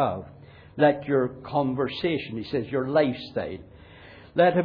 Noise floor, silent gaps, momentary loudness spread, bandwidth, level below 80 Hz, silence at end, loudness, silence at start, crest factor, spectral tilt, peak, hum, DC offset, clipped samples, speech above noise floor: -48 dBFS; none; 14 LU; 5.2 kHz; -56 dBFS; 0 s; -26 LUFS; 0 s; 18 dB; -9 dB/octave; -8 dBFS; none; under 0.1%; under 0.1%; 23 dB